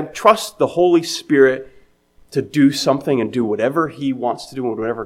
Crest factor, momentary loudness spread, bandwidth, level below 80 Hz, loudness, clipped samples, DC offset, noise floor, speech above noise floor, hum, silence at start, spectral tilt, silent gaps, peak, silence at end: 18 dB; 10 LU; 15.5 kHz; -56 dBFS; -18 LUFS; under 0.1%; under 0.1%; -51 dBFS; 35 dB; none; 0 s; -5 dB/octave; none; 0 dBFS; 0 s